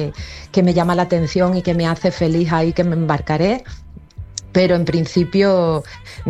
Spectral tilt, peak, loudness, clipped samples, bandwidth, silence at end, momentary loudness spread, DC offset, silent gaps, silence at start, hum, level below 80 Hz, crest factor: -7 dB/octave; -2 dBFS; -17 LUFS; under 0.1%; 10.5 kHz; 0 s; 13 LU; under 0.1%; none; 0 s; none; -38 dBFS; 14 dB